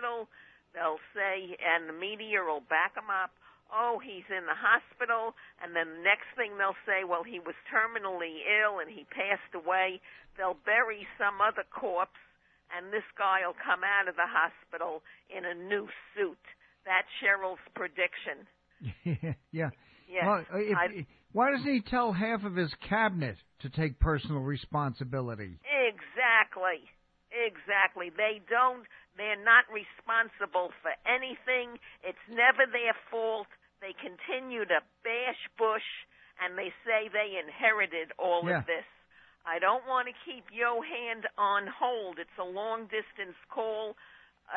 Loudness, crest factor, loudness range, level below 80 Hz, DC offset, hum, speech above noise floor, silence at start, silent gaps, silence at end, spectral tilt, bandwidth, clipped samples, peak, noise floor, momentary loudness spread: -31 LUFS; 24 dB; 5 LU; -54 dBFS; under 0.1%; none; 30 dB; 0 s; none; 0 s; -8.5 dB/octave; 4.8 kHz; under 0.1%; -8 dBFS; -62 dBFS; 14 LU